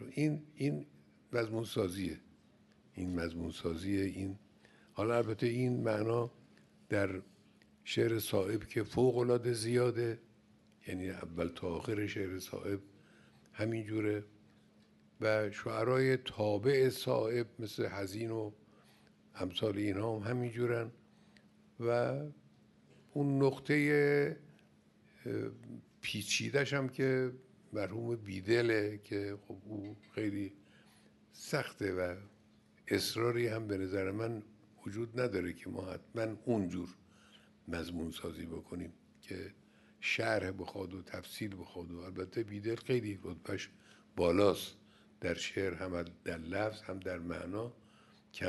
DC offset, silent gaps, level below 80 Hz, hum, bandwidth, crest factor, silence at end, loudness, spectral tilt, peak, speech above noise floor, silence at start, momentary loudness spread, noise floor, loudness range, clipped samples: under 0.1%; none; -66 dBFS; none; 12 kHz; 20 dB; 0 s; -37 LUFS; -5.5 dB/octave; -16 dBFS; 30 dB; 0 s; 15 LU; -66 dBFS; 7 LU; under 0.1%